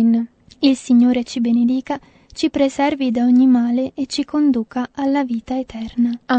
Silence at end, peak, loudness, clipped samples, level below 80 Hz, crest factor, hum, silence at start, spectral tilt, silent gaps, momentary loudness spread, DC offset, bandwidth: 0 s; -2 dBFS; -18 LUFS; under 0.1%; -52 dBFS; 16 dB; none; 0 s; -5 dB/octave; none; 11 LU; under 0.1%; 8.8 kHz